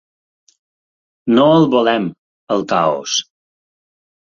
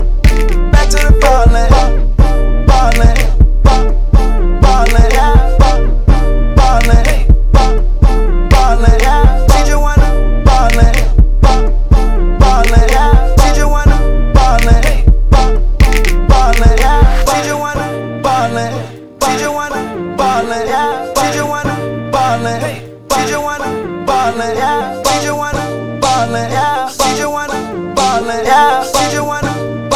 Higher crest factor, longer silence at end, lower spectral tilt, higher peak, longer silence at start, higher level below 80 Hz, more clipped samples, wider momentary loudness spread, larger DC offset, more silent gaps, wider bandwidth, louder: first, 18 dB vs 8 dB; first, 1 s vs 0 s; about the same, -4.5 dB/octave vs -5 dB/octave; about the same, 0 dBFS vs 0 dBFS; first, 1.25 s vs 0 s; second, -58 dBFS vs -10 dBFS; second, under 0.1% vs 1%; first, 10 LU vs 7 LU; second, under 0.1% vs 2%; first, 2.18-2.47 s vs none; second, 7.4 kHz vs 14 kHz; second, -15 LUFS vs -12 LUFS